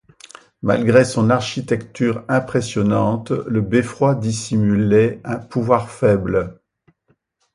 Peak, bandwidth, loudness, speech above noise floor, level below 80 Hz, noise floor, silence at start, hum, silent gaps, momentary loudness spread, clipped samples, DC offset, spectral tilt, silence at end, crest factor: 0 dBFS; 11.5 kHz; -18 LUFS; 47 dB; -46 dBFS; -64 dBFS; 0.65 s; none; none; 8 LU; under 0.1%; under 0.1%; -6.5 dB/octave; 1 s; 18 dB